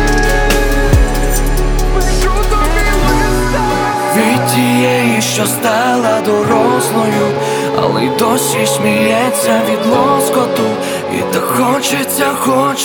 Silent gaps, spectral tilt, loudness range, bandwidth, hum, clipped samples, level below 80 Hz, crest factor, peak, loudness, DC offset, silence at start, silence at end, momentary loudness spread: none; -4.5 dB/octave; 2 LU; 19.5 kHz; none; under 0.1%; -18 dBFS; 12 dB; 0 dBFS; -12 LUFS; under 0.1%; 0 s; 0 s; 4 LU